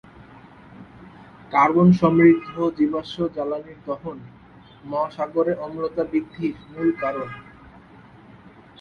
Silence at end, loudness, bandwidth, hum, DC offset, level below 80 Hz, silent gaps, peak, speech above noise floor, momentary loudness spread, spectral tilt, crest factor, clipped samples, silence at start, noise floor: 1.4 s; -22 LUFS; 6.6 kHz; none; under 0.1%; -56 dBFS; none; -4 dBFS; 26 dB; 16 LU; -9 dB/octave; 20 dB; under 0.1%; 0.75 s; -47 dBFS